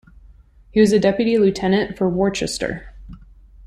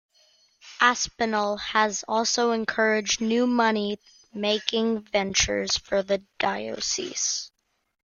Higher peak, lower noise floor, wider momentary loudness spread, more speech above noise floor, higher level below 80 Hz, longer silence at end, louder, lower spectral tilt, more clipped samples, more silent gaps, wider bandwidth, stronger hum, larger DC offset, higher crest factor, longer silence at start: about the same, -2 dBFS vs -2 dBFS; second, -47 dBFS vs -62 dBFS; first, 10 LU vs 7 LU; second, 30 dB vs 37 dB; first, -44 dBFS vs -54 dBFS; about the same, 0.5 s vs 0.55 s; first, -18 LUFS vs -24 LUFS; first, -5.5 dB/octave vs -2 dB/octave; neither; neither; first, 13 kHz vs 10 kHz; neither; neither; second, 18 dB vs 24 dB; about the same, 0.75 s vs 0.65 s